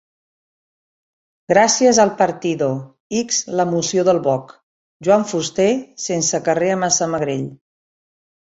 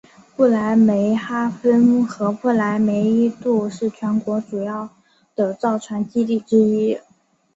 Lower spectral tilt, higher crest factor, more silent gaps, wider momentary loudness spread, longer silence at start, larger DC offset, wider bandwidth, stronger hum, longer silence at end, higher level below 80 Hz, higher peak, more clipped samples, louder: second, -3.5 dB/octave vs -7.5 dB/octave; about the same, 18 dB vs 14 dB; first, 3.00-3.10 s, 4.63-5.00 s vs none; about the same, 10 LU vs 10 LU; first, 1.5 s vs 0.4 s; neither; about the same, 8.2 kHz vs 7.8 kHz; neither; first, 1 s vs 0.55 s; about the same, -60 dBFS vs -62 dBFS; first, 0 dBFS vs -4 dBFS; neither; about the same, -17 LUFS vs -19 LUFS